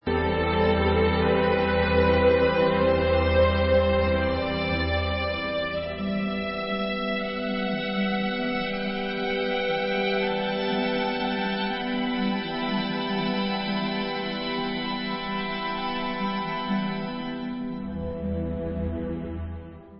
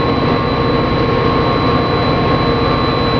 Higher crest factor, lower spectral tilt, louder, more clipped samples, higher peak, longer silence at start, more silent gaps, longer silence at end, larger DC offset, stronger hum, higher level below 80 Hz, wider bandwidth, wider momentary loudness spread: about the same, 16 dB vs 12 dB; first, -10.5 dB/octave vs -8 dB/octave; second, -26 LUFS vs -14 LUFS; neither; second, -8 dBFS vs 0 dBFS; about the same, 0.05 s vs 0 s; neither; about the same, 0 s vs 0 s; neither; neither; second, -38 dBFS vs -28 dBFS; about the same, 5.8 kHz vs 5.4 kHz; first, 9 LU vs 1 LU